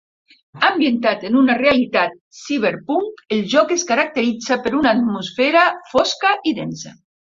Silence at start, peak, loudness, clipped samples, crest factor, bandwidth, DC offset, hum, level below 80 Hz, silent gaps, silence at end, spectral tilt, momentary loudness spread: 0.55 s; 0 dBFS; -17 LUFS; under 0.1%; 18 dB; 7.6 kHz; under 0.1%; none; -56 dBFS; 2.21-2.31 s; 0.3 s; -3.5 dB/octave; 9 LU